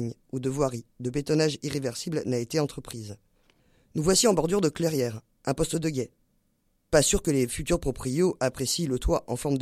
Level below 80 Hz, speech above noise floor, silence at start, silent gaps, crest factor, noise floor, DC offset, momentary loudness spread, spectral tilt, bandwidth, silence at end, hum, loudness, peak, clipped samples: -42 dBFS; 44 dB; 0 s; none; 20 dB; -71 dBFS; under 0.1%; 12 LU; -4.5 dB/octave; 16 kHz; 0 s; none; -27 LUFS; -8 dBFS; under 0.1%